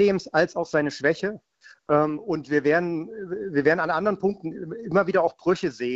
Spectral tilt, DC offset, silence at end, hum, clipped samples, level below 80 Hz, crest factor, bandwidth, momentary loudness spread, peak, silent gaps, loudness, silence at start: -6.5 dB/octave; under 0.1%; 0 s; none; under 0.1%; -62 dBFS; 18 dB; 8 kHz; 11 LU; -6 dBFS; none; -24 LUFS; 0 s